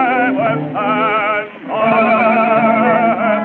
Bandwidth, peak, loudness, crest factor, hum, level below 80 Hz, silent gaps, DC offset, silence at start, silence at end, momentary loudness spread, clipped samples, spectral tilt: 4.4 kHz; -2 dBFS; -14 LUFS; 12 dB; none; -68 dBFS; none; under 0.1%; 0 s; 0 s; 6 LU; under 0.1%; -9 dB/octave